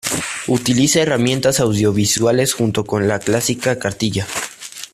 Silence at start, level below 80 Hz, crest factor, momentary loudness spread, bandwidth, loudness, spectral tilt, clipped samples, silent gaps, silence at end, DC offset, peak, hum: 0.05 s; -48 dBFS; 14 dB; 7 LU; 15.5 kHz; -17 LUFS; -4 dB/octave; under 0.1%; none; 0.1 s; under 0.1%; -2 dBFS; none